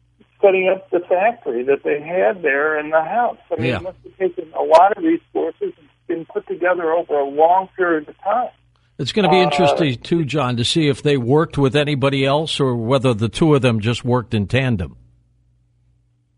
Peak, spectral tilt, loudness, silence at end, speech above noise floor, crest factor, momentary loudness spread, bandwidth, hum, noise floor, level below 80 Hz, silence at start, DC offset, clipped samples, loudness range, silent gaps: 0 dBFS; -6 dB/octave; -18 LUFS; 1.45 s; 42 dB; 18 dB; 10 LU; 11 kHz; none; -60 dBFS; -50 dBFS; 0.4 s; under 0.1%; under 0.1%; 3 LU; none